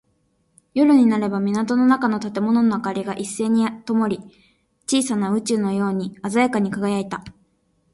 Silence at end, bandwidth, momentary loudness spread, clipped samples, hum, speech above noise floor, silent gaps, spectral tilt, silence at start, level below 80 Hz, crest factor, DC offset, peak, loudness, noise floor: 0.65 s; 11.5 kHz; 10 LU; under 0.1%; none; 46 dB; none; -5.5 dB/octave; 0.75 s; -60 dBFS; 16 dB; under 0.1%; -4 dBFS; -20 LUFS; -66 dBFS